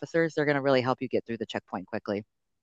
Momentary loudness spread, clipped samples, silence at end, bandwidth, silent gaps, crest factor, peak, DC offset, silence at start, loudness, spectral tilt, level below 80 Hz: 11 LU; under 0.1%; 0.4 s; 8 kHz; none; 18 dB; -10 dBFS; under 0.1%; 0 s; -29 LUFS; -6.5 dB/octave; -72 dBFS